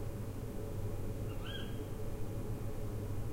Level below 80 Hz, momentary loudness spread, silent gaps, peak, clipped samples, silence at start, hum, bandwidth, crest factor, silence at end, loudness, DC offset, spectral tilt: -44 dBFS; 2 LU; none; -26 dBFS; under 0.1%; 0 s; none; 16 kHz; 12 dB; 0 s; -43 LUFS; under 0.1%; -6.5 dB/octave